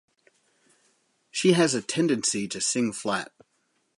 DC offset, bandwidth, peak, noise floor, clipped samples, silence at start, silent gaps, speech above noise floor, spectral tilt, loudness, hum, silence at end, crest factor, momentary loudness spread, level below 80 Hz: under 0.1%; 11.5 kHz; -6 dBFS; -72 dBFS; under 0.1%; 1.35 s; none; 47 dB; -3.5 dB/octave; -25 LUFS; none; 0.75 s; 22 dB; 10 LU; -72 dBFS